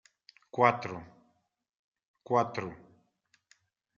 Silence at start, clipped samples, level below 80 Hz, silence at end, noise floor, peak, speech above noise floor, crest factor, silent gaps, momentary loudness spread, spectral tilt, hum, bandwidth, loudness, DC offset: 0.55 s; under 0.1%; -74 dBFS; 1.2 s; -77 dBFS; -8 dBFS; 47 dB; 26 dB; 1.79-1.92 s, 2.05-2.14 s; 16 LU; -4.5 dB/octave; none; 7.6 kHz; -30 LUFS; under 0.1%